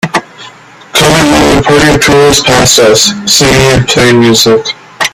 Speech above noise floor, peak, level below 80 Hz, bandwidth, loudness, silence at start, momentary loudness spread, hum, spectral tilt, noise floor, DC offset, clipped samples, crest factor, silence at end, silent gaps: 26 dB; 0 dBFS; -28 dBFS; over 20 kHz; -5 LUFS; 0.05 s; 8 LU; none; -3.5 dB/octave; -31 dBFS; under 0.1%; 1%; 6 dB; 0.05 s; none